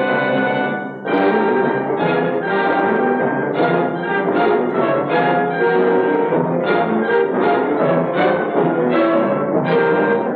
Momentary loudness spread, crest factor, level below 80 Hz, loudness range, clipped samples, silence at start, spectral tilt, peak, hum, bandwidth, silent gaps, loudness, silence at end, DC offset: 3 LU; 12 dB; -68 dBFS; 1 LU; under 0.1%; 0 s; -9.5 dB/octave; -4 dBFS; none; 4.9 kHz; none; -17 LUFS; 0 s; under 0.1%